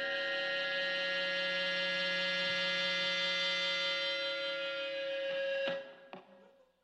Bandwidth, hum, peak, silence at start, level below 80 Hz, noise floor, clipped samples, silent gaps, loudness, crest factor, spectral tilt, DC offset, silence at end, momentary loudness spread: 9.4 kHz; none; -24 dBFS; 0 s; -88 dBFS; -63 dBFS; under 0.1%; none; -33 LUFS; 12 dB; -2 dB/octave; under 0.1%; 0.4 s; 6 LU